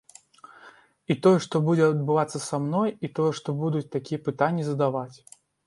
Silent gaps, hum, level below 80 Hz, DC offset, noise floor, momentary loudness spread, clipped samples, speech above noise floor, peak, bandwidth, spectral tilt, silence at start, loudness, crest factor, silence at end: none; none; -70 dBFS; under 0.1%; -53 dBFS; 9 LU; under 0.1%; 28 dB; -6 dBFS; 11.5 kHz; -7 dB/octave; 0.65 s; -25 LUFS; 18 dB; 0.55 s